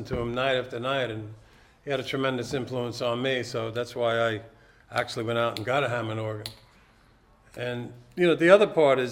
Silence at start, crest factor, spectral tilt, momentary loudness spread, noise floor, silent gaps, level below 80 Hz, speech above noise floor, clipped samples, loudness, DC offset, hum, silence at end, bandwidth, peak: 0 s; 24 dB; -5.5 dB/octave; 16 LU; -59 dBFS; none; -56 dBFS; 33 dB; under 0.1%; -26 LUFS; under 0.1%; none; 0 s; 16 kHz; -4 dBFS